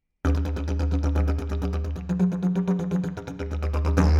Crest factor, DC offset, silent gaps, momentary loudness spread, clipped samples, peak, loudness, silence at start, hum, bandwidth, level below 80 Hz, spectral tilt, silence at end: 18 dB; under 0.1%; none; 7 LU; under 0.1%; -6 dBFS; -26 LUFS; 0.25 s; none; 7.4 kHz; -28 dBFS; -8 dB/octave; 0 s